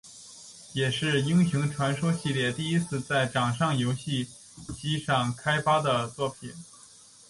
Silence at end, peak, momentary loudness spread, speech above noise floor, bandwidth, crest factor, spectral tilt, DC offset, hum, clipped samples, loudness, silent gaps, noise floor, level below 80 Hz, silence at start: 0.65 s; -12 dBFS; 19 LU; 26 dB; 11.5 kHz; 16 dB; -5 dB/octave; under 0.1%; none; under 0.1%; -27 LUFS; none; -53 dBFS; -58 dBFS; 0.05 s